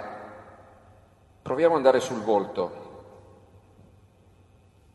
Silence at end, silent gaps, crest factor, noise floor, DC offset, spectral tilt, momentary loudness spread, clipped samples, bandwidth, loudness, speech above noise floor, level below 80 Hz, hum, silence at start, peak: 1.9 s; none; 24 dB; -57 dBFS; under 0.1%; -5.5 dB/octave; 25 LU; under 0.1%; 12 kHz; -24 LUFS; 34 dB; -64 dBFS; none; 0 s; -4 dBFS